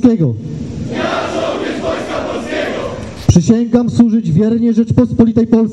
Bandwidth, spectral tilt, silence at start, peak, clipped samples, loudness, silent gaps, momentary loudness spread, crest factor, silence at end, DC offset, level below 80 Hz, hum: 9.2 kHz; -7 dB/octave; 0 s; 0 dBFS; 0.7%; -14 LUFS; none; 10 LU; 12 dB; 0 s; 0.6%; -36 dBFS; none